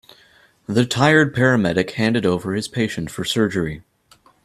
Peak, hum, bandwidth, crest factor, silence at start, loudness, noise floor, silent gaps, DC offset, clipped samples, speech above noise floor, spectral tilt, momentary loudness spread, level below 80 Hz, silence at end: 0 dBFS; none; 14 kHz; 20 dB; 0.7 s; -19 LUFS; -55 dBFS; none; under 0.1%; under 0.1%; 36 dB; -5.5 dB/octave; 11 LU; -52 dBFS; 0.65 s